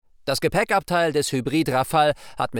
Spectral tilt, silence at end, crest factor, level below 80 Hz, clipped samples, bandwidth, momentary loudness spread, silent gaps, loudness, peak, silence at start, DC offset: -4.5 dB/octave; 0 s; 14 dB; -50 dBFS; under 0.1%; over 20 kHz; 4 LU; none; -22 LUFS; -8 dBFS; 0.25 s; under 0.1%